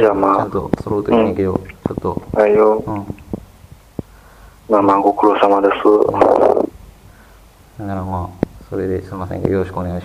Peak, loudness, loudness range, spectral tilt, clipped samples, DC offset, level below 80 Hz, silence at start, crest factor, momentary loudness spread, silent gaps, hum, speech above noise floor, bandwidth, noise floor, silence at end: 0 dBFS; -16 LUFS; 6 LU; -8 dB/octave; under 0.1%; under 0.1%; -42 dBFS; 0 s; 16 dB; 16 LU; none; none; 29 dB; 14.5 kHz; -44 dBFS; 0 s